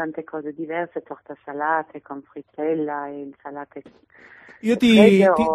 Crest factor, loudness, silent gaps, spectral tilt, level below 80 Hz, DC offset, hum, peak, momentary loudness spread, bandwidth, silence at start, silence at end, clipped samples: 20 dB; -20 LUFS; none; -6.5 dB/octave; -58 dBFS; under 0.1%; none; 0 dBFS; 24 LU; 13 kHz; 0 s; 0 s; under 0.1%